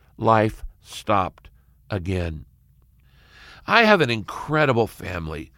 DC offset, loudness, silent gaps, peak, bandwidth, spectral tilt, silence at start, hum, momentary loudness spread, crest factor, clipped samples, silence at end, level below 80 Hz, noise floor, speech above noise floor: under 0.1%; -21 LUFS; none; -2 dBFS; 16.5 kHz; -6 dB/octave; 0.2 s; none; 16 LU; 22 dB; under 0.1%; 0.1 s; -44 dBFS; -56 dBFS; 35 dB